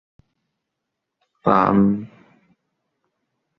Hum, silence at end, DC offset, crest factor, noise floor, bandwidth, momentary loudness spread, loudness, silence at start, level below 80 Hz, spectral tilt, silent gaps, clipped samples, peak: none; 1.5 s; under 0.1%; 22 dB; -80 dBFS; 5.2 kHz; 14 LU; -18 LUFS; 1.45 s; -56 dBFS; -10 dB/octave; none; under 0.1%; -2 dBFS